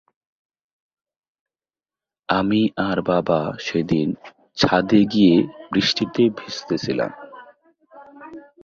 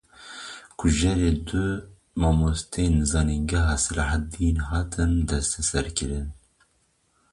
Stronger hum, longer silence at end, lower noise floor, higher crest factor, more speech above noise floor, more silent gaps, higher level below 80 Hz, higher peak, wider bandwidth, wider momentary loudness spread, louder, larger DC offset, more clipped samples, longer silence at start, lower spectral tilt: neither; second, 0.25 s vs 1 s; first, under -90 dBFS vs -67 dBFS; about the same, 20 dB vs 16 dB; first, over 71 dB vs 44 dB; neither; second, -54 dBFS vs -30 dBFS; first, -2 dBFS vs -10 dBFS; second, 7.4 kHz vs 11.5 kHz; first, 19 LU vs 14 LU; first, -20 LUFS vs -25 LUFS; neither; neither; first, 2.3 s vs 0.2 s; about the same, -6 dB/octave vs -5 dB/octave